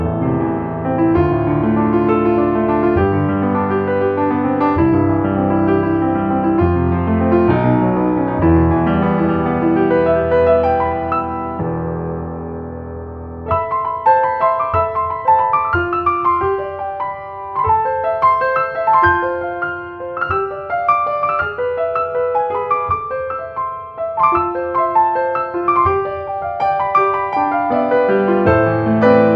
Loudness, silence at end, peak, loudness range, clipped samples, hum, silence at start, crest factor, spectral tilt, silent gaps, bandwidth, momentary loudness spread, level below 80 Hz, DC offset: -16 LUFS; 0 s; 0 dBFS; 4 LU; under 0.1%; none; 0 s; 16 dB; -10.5 dB/octave; none; 5.2 kHz; 9 LU; -36 dBFS; under 0.1%